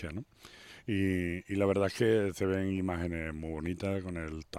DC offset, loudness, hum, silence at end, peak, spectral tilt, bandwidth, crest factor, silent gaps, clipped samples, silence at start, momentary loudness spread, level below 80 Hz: under 0.1%; -33 LUFS; none; 0 s; -14 dBFS; -7 dB/octave; 16 kHz; 18 dB; none; under 0.1%; 0 s; 16 LU; -56 dBFS